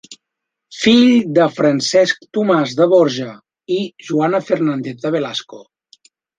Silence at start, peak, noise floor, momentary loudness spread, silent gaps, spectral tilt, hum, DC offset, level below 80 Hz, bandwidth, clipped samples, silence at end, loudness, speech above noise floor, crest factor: 0.1 s; -2 dBFS; -80 dBFS; 11 LU; none; -5 dB/octave; none; under 0.1%; -60 dBFS; 9.4 kHz; under 0.1%; 0.75 s; -15 LUFS; 65 dB; 14 dB